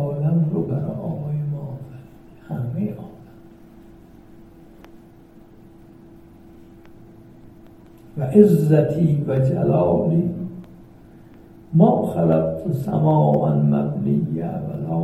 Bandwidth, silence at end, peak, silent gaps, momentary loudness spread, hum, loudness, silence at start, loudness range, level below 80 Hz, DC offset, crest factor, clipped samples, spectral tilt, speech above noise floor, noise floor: 13 kHz; 0 s; 0 dBFS; none; 16 LU; none; -20 LUFS; 0 s; 15 LU; -52 dBFS; under 0.1%; 22 dB; under 0.1%; -10.5 dB/octave; 29 dB; -46 dBFS